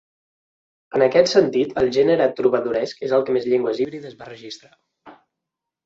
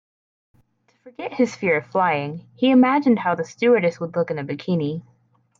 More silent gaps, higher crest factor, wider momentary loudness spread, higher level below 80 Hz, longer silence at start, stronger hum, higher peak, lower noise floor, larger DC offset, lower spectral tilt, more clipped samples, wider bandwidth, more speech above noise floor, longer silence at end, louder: neither; about the same, 20 dB vs 16 dB; first, 20 LU vs 12 LU; first, -60 dBFS vs -68 dBFS; about the same, 0.95 s vs 1.05 s; neither; first, -2 dBFS vs -6 dBFS; first, -84 dBFS vs -62 dBFS; neither; second, -5 dB/octave vs -7 dB/octave; neither; about the same, 7.8 kHz vs 7.4 kHz; first, 64 dB vs 42 dB; first, 0.75 s vs 0.6 s; about the same, -19 LUFS vs -20 LUFS